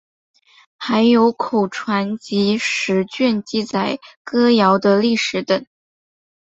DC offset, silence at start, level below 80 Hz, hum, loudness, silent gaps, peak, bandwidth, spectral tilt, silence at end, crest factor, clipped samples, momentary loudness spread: under 0.1%; 0.8 s; -62 dBFS; none; -17 LUFS; 4.16-4.25 s; -2 dBFS; 8 kHz; -5 dB/octave; 0.85 s; 16 dB; under 0.1%; 8 LU